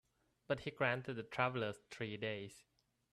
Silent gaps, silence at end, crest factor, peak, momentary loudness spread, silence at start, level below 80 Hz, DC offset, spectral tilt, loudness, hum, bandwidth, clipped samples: none; 0.5 s; 24 dB; -20 dBFS; 9 LU; 0.5 s; -74 dBFS; under 0.1%; -6 dB/octave; -41 LUFS; none; 13 kHz; under 0.1%